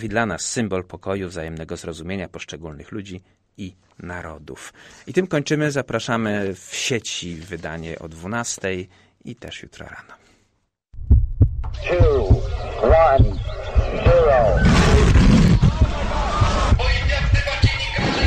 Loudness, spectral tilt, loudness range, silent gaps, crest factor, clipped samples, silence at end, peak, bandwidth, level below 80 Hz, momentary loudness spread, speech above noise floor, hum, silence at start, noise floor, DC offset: -19 LUFS; -5.5 dB/octave; 15 LU; none; 14 dB; under 0.1%; 0 s; -4 dBFS; 10 kHz; -24 dBFS; 22 LU; 47 dB; none; 0 s; -68 dBFS; under 0.1%